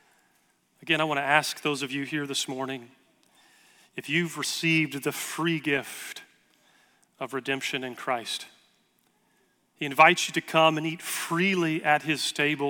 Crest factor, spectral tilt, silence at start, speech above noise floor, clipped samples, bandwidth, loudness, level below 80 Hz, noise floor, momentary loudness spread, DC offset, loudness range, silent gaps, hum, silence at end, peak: 24 dB; -3.5 dB/octave; 0.8 s; 42 dB; under 0.1%; 18 kHz; -26 LUFS; -76 dBFS; -68 dBFS; 15 LU; under 0.1%; 10 LU; none; none; 0 s; -4 dBFS